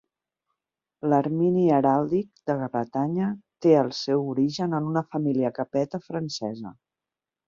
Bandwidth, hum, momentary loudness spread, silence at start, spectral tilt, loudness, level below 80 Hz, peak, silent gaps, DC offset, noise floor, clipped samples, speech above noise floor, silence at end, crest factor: 7.6 kHz; none; 11 LU; 1.05 s; -7.5 dB/octave; -25 LUFS; -68 dBFS; -6 dBFS; none; under 0.1%; -89 dBFS; under 0.1%; 65 dB; 0.75 s; 18 dB